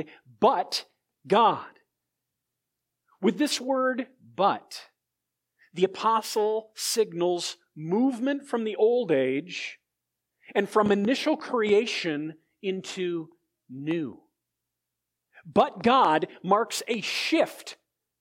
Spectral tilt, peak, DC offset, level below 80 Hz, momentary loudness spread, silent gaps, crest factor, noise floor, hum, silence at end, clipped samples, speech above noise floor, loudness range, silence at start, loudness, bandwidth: -4 dB/octave; -6 dBFS; under 0.1%; -72 dBFS; 14 LU; none; 22 dB; -85 dBFS; none; 0.45 s; under 0.1%; 59 dB; 4 LU; 0 s; -26 LUFS; 16.5 kHz